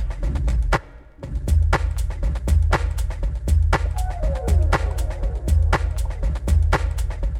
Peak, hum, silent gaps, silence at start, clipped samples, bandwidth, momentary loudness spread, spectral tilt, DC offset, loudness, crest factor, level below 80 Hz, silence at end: -4 dBFS; none; none; 0 s; under 0.1%; 13.5 kHz; 7 LU; -6 dB/octave; under 0.1%; -23 LUFS; 16 dB; -22 dBFS; 0 s